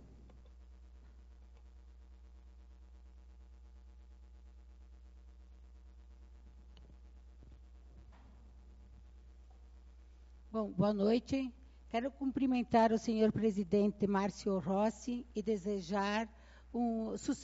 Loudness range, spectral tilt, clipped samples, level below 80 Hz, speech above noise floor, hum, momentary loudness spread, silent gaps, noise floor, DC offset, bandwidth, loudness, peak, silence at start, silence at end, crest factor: 6 LU; -6 dB/octave; under 0.1%; -58 dBFS; 23 dB; none; 10 LU; none; -57 dBFS; under 0.1%; 7.6 kHz; -35 LUFS; -18 dBFS; 0 s; 0 s; 20 dB